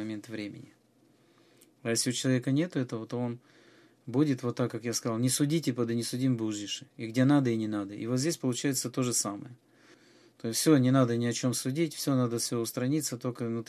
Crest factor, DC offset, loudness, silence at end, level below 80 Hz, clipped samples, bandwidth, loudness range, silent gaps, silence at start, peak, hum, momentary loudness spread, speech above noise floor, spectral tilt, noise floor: 20 dB; under 0.1%; -30 LUFS; 0.05 s; -76 dBFS; under 0.1%; 15 kHz; 4 LU; none; 0 s; -10 dBFS; none; 13 LU; 35 dB; -5 dB/octave; -65 dBFS